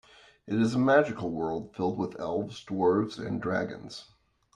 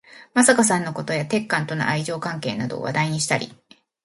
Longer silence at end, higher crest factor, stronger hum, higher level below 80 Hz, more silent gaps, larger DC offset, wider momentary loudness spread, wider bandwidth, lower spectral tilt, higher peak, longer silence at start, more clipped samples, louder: about the same, 0.55 s vs 0.5 s; about the same, 20 dB vs 22 dB; neither; about the same, -64 dBFS vs -64 dBFS; neither; neither; about the same, 12 LU vs 11 LU; about the same, 10.5 kHz vs 11.5 kHz; first, -7 dB/octave vs -4 dB/octave; second, -8 dBFS vs -2 dBFS; first, 0.45 s vs 0.1 s; neither; second, -29 LUFS vs -22 LUFS